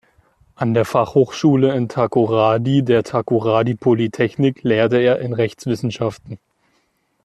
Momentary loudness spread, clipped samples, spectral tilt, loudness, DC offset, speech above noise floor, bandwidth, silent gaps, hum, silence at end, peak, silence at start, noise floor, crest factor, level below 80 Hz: 8 LU; under 0.1%; -7.5 dB/octave; -17 LUFS; under 0.1%; 48 dB; 13 kHz; none; none; 0.9 s; -2 dBFS; 0.6 s; -65 dBFS; 16 dB; -56 dBFS